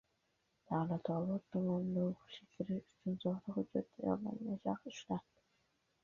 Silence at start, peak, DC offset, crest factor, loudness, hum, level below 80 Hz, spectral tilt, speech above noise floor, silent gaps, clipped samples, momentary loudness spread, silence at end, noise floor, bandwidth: 0.7 s; -22 dBFS; under 0.1%; 18 dB; -41 LUFS; none; -74 dBFS; -8 dB/octave; 41 dB; none; under 0.1%; 7 LU; 0.8 s; -81 dBFS; 7.2 kHz